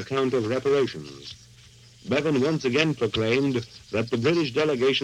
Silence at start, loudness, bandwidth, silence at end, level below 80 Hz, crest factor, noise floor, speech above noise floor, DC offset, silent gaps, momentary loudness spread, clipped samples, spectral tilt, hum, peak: 0 s; -24 LUFS; 11 kHz; 0 s; -58 dBFS; 20 dB; -51 dBFS; 27 dB; under 0.1%; none; 16 LU; under 0.1%; -5.5 dB/octave; none; -6 dBFS